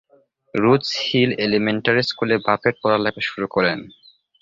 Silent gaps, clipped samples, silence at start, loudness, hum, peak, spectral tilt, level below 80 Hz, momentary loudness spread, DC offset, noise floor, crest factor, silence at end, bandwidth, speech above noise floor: none; under 0.1%; 0.55 s; -19 LUFS; none; -2 dBFS; -5.5 dB/octave; -56 dBFS; 5 LU; under 0.1%; -58 dBFS; 18 dB; 0.5 s; 7.6 kHz; 38 dB